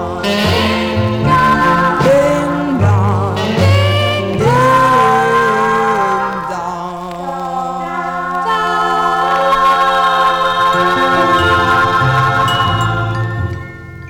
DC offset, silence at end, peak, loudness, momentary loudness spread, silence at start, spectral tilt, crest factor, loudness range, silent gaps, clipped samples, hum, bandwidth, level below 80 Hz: 0.2%; 0 s; -2 dBFS; -13 LUFS; 9 LU; 0 s; -5.5 dB/octave; 12 dB; 5 LU; none; under 0.1%; none; 18 kHz; -36 dBFS